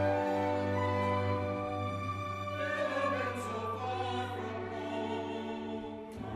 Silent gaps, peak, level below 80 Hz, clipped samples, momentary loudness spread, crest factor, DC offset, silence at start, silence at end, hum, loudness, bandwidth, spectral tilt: none; -20 dBFS; -66 dBFS; under 0.1%; 7 LU; 16 dB; under 0.1%; 0 s; 0 s; none; -35 LUFS; 13 kHz; -6.5 dB/octave